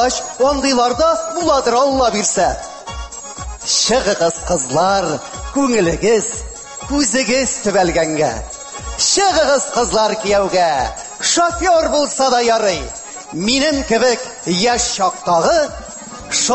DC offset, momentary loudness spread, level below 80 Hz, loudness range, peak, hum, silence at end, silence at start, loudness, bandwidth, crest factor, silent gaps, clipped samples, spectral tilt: under 0.1%; 14 LU; -36 dBFS; 2 LU; -4 dBFS; none; 0 s; 0 s; -15 LUFS; 8.6 kHz; 12 dB; none; under 0.1%; -2.5 dB/octave